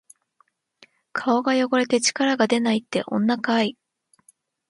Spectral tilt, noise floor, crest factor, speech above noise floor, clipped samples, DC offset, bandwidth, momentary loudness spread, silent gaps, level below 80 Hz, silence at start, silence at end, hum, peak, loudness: -3.5 dB/octave; -65 dBFS; 18 dB; 44 dB; under 0.1%; under 0.1%; 11.5 kHz; 6 LU; none; -70 dBFS; 1.15 s; 1 s; none; -4 dBFS; -22 LUFS